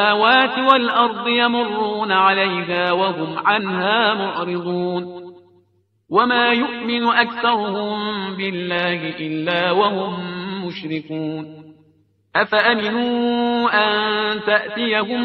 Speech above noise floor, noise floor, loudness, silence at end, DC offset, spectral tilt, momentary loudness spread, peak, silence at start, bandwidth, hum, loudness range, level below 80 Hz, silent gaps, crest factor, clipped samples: 43 dB; -62 dBFS; -18 LUFS; 0 s; under 0.1%; -7 dB/octave; 12 LU; 0 dBFS; 0 s; 6 kHz; none; 5 LU; -64 dBFS; none; 18 dB; under 0.1%